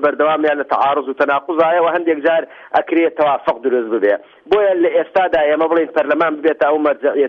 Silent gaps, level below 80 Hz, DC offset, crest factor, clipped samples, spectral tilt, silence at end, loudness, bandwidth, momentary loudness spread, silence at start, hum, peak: none; -58 dBFS; under 0.1%; 14 dB; under 0.1%; -6.5 dB/octave; 0 s; -16 LUFS; 6 kHz; 4 LU; 0 s; none; -2 dBFS